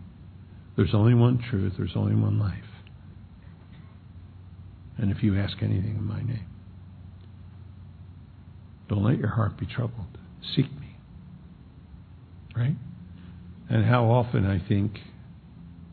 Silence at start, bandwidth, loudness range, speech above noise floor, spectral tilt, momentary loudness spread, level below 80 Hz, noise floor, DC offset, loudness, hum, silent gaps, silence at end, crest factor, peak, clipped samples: 0 s; 4.5 kHz; 8 LU; 23 dB; -11.5 dB/octave; 25 LU; -50 dBFS; -48 dBFS; under 0.1%; -26 LUFS; none; none; 0.05 s; 22 dB; -6 dBFS; under 0.1%